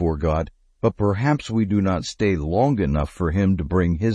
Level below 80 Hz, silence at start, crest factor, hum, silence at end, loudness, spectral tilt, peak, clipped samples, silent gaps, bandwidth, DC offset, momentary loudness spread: -34 dBFS; 0 s; 16 dB; none; 0 s; -22 LUFS; -7.5 dB/octave; -6 dBFS; under 0.1%; none; 11 kHz; under 0.1%; 4 LU